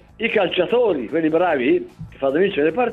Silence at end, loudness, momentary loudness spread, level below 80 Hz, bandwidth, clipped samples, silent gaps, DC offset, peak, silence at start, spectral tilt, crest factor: 0 s; -19 LUFS; 4 LU; -52 dBFS; 4.6 kHz; under 0.1%; none; under 0.1%; -6 dBFS; 0.2 s; -7.5 dB/octave; 14 dB